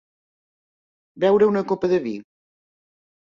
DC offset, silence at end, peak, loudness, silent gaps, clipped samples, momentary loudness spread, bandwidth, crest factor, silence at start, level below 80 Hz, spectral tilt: under 0.1%; 1.05 s; -6 dBFS; -20 LUFS; none; under 0.1%; 13 LU; 7.2 kHz; 18 dB; 1.15 s; -64 dBFS; -7.5 dB/octave